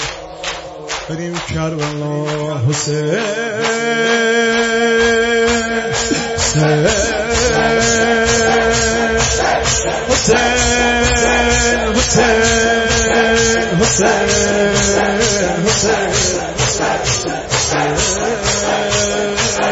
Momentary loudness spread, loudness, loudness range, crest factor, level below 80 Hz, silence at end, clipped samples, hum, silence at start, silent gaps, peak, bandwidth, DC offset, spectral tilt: 8 LU; -14 LUFS; 4 LU; 14 dB; -30 dBFS; 0 s; under 0.1%; none; 0 s; none; 0 dBFS; 8 kHz; under 0.1%; -3 dB/octave